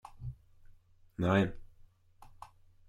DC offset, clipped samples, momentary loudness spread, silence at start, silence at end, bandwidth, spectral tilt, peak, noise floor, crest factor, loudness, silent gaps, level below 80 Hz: under 0.1%; under 0.1%; 26 LU; 0.05 s; 0.4 s; 11.5 kHz; -7.5 dB/octave; -16 dBFS; -60 dBFS; 22 dB; -32 LUFS; none; -56 dBFS